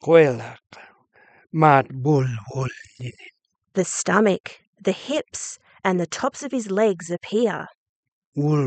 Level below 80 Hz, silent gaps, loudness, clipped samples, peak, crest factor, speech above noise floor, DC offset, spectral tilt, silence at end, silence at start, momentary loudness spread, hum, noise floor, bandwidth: -64 dBFS; 4.40-4.44 s, 4.67-4.73 s, 7.77-8.32 s; -22 LUFS; under 0.1%; 0 dBFS; 22 dB; 35 dB; under 0.1%; -5.5 dB/octave; 0 s; 0.05 s; 18 LU; none; -56 dBFS; 9.2 kHz